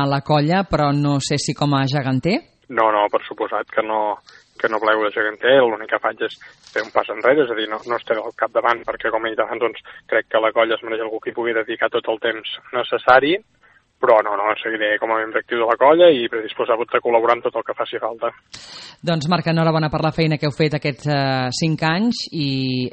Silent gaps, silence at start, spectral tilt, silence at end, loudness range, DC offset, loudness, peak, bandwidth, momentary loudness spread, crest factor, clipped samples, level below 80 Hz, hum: none; 0 s; -5.5 dB/octave; 0 s; 4 LU; under 0.1%; -19 LUFS; 0 dBFS; 8.4 kHz; 9 LU; 20 dB; under 0.1%; -52 dBFS; none